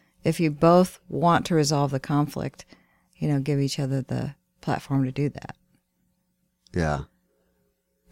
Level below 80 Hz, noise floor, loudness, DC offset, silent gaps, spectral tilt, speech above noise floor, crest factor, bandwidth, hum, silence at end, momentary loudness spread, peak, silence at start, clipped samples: -50 dBFS; -73 dBFS; -25 LUFS; under 0.1%; none; -6.5 dB/octave; 49 dB; 20 dB; 16.5 kHz; none; 1.1 s; 13 LU; -6 dBFS; 0.25 s; under 0.1%